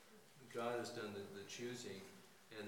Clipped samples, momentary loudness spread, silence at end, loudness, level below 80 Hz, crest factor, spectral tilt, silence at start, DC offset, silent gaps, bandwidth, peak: under 0.1%; 18 LU; 0 s; -49 LUFS; under -90 dBFS; 18 dB; -4 dB/octave; 0 s; under 0.1%; none; 18 kHz; -32 dBFS